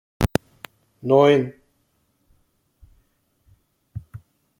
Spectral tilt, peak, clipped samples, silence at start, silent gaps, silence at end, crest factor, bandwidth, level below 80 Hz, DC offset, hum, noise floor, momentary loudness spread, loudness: -6.5 dB/octave; -2 dBFS; under 0.1%; 0.2 s; none; 0.4 s; 22 dB; 16.5 kHz; -44 dBFS; under 0.1%; none; -68 dBFS; 28 LU; -20 LUFS